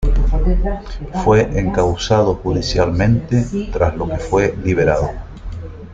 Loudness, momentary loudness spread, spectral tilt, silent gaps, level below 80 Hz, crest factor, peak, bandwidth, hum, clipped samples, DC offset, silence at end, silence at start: -17 LUFS; 12 LU; -6.5 dB/octave; none; -22 dBFS; 14 dB; -2 dBFS; 7.8 kHz; none; under 0.1%; under 0.1%; 0 s; 0 s